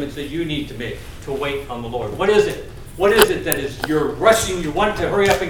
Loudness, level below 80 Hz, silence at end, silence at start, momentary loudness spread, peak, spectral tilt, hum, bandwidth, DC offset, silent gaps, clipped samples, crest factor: -19 LUFS; -38 dBFS; 0 s; 0 s; 14 LU; 0 dBFS; -4 dB/octave; none; 18 kHz; under 0.1%; none; under 0.1%; 20 dB